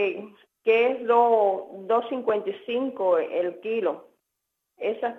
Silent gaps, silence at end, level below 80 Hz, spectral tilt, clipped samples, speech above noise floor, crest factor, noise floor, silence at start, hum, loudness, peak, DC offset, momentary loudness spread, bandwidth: none; 0 s; -84 dBFS; -6.5 dB/octave; under 0.1%; 57 dB; 18 dB; -81 dBFS; 0 s; none; -25 LUFS; -8 dBFS; under 0.1%; 10 LU; 4.1 kHz